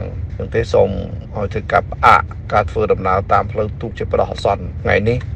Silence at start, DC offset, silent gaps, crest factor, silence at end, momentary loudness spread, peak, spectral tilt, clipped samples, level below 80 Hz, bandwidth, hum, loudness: 0 s; under 0.1%; none; 16 dB; 0 s; 12 LU; 0 dBFS; -7 dB/octave; under 0.1%; -30 dBFS; 10 kHz; none; -17 LUFS